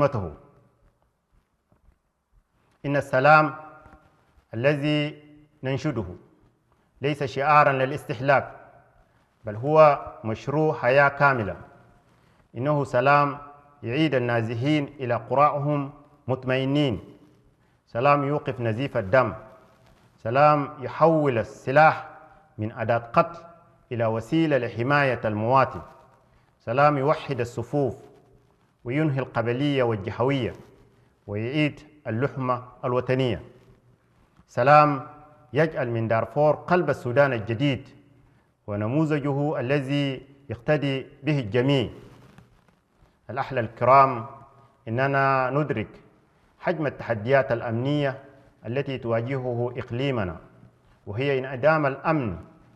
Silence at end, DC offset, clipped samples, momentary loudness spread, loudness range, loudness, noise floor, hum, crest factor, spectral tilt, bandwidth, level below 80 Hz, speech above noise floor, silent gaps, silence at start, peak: 0.3 s; under 0.1%; under 0.1%; 16 LU; 5 LU; -24 LUFS; -67 dBFS; none; 22 dB; -7.5 dB/octave; 11.5 kHz; -60 dBFS; 44 dB; none; 0 s; -2 dBFS